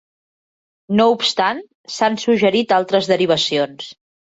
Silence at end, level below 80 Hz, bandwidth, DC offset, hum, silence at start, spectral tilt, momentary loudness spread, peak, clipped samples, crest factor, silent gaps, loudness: 0.45 s; -62 dBFS; 8 kHz; under 0.1%; none; 0.9 s; -4.5 dB/octave; 14 LU; -2 dBFS; under 0.1%; 16 dB; 1.75-1.84 s; -17 LUFS